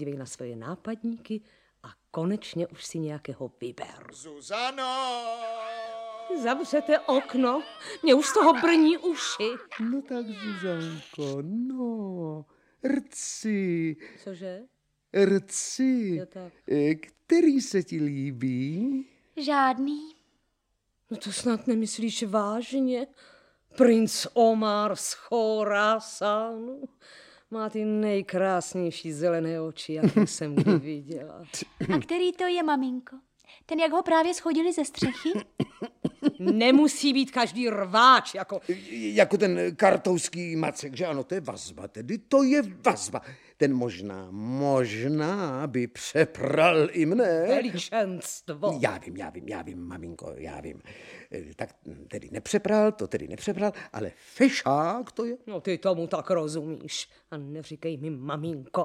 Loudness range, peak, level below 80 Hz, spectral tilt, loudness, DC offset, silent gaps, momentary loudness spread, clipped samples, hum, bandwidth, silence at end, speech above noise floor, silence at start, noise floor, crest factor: 10 LU; -6 dBFS; -66 dBFS; -5 dB/octave; -26 LUFS; under 0.1%; none; 17 LU; under 0.1%; none; 15.5 kHz; 0 s; 49 dB; 0 s; -76 dBFS; 22 dB